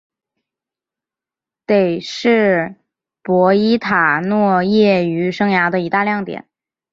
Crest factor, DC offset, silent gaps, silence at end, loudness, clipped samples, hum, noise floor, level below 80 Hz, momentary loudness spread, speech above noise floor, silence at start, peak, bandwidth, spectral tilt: 16 dB; under 0.1%; none; 0.5 s; -15 LUFS; under 0.1%; none; -88 dBFS; -58 dBFS; 10 LU; 74 dB; 1.7 s; -2 dBFS; 7.6 kHz; -7 dB/octave